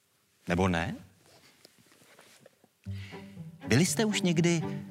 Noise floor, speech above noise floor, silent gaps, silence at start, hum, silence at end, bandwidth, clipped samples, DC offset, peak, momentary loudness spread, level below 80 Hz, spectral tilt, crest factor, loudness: -61 dBFS; 34 dB; none; 0.45 s; none; 0 s; 15.5 kHz; under 0.1%; under 0.1%; -12 dBFS; 20 LU; -64 dBFS; -5 dB/octave; 20 dB; -28 LUFS